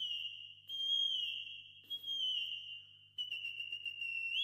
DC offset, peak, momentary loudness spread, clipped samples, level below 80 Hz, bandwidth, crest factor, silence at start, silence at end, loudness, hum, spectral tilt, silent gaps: under 0.1%; -26 dBFS; 16 LU; under 0.1%; under -90 dBFS; 16 kHz; 14 dB; 0 s; 0 s; -38 LUFS; 50 Hz at -75 dBFS; 1.5 dB/octave; none